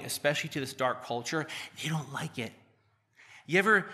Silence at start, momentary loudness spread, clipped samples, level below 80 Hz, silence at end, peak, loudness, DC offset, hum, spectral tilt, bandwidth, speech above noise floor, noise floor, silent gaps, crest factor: 0 s; 13 LU; under 0.1%; -78 dBFS; 0 s; -12 dBFS; -31 LUFS; under 0.1%; none; -4 dB/octave; 15 kHz; 38 dB; -69 dBFS; none; 20 dB